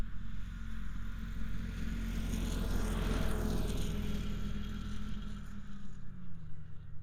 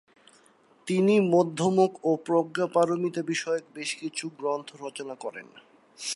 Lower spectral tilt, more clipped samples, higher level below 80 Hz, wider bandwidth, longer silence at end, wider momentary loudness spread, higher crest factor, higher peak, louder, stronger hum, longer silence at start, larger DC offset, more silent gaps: about the same, -6 dB/octave vs -5 dB/octave; neither; first, -40 dBFS vs -78 dBFS; first, 15.5 kHz vs 11.5 kHz; about the same, 0 s vs 0 s; about the same, 14 LU vs 15 LU; about the same, 14 dB vs 18 dB; second, -20 dBFS vs -10 dBFS; second, -41 LUFS vs -26 LUFS; neither; second, 0 s vs 0.85 s; neither; neither